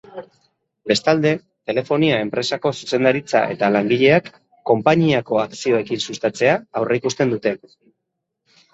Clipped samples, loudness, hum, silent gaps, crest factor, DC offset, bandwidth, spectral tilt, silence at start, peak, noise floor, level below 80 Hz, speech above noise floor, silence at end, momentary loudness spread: under 0.1%; -19 LUFS; none; none; 18 dB; under 0.1%; 8.2 kHz; -5.5 dB/octave; 0.15 s; -2 dBFS; -78 dBFS; -60 dBFS; 60 dB; 1.15 s; 9 LU